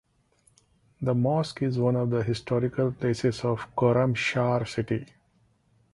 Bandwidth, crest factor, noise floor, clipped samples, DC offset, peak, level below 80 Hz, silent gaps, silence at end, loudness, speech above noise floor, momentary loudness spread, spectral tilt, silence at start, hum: 11.5 kHz; 18 dB; -66 dBFS; under 0.1%; under 0.1%; -8 dBFS; -56 dBFS; none; 0.9 s; -27 LUFS; 40 dB; 6 LU; -7 dB/octave; 1 s; none